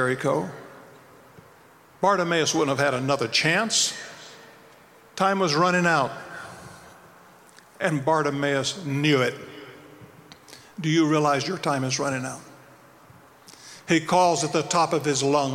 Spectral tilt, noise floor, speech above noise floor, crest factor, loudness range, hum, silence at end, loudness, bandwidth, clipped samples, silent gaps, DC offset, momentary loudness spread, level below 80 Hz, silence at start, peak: -4 dB/octave; -53 dBFS; 30 dB; 18 dB; 3 LU; none; 0 s; -23 LUFS; 16.5 kHz; under 0.1%; none; under 0.1%; 21 LU; -66 dBFS; 0 s; -8 dBFS